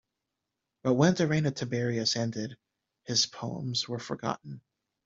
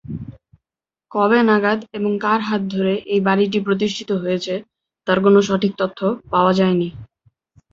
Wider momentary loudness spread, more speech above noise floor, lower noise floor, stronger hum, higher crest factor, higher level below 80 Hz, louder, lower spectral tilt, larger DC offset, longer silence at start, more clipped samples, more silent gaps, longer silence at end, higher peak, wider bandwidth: about the same, 15 LU vs 13 LU; second, 56 dB vs 70 dB; about the same, -86 dBFS vs -88 dBFS; neither; about the same, 22 dB vs 18 dB; second, -66 dBFS vs -54 dBFS; second, -29 LUFS vs -18 LUFS; second, -4.5 dB/octave vs -6.5 dB/octave; neither; first, 0.85 s vs 0.1 s; neither; neither; second, 0.45 s vs 0.7 s; second, -10 dBFS vs -2 dBFS; about the same, 7.8 kHz vs 7.6 kHz